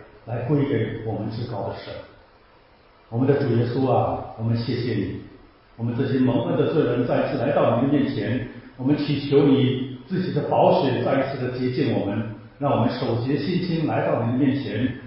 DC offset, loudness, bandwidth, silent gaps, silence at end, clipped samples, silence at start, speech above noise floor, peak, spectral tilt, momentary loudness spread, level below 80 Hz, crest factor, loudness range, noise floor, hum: under 0.1%; -23 LUFS; 5.8 kHz; none; 0 s; under 0.1%; 0 s; 32 dB; -6 dBFS; -11.5 dB/octave; 11 LU; -50 dBFS; 18 dB; 4 LU; -54 dBFS; none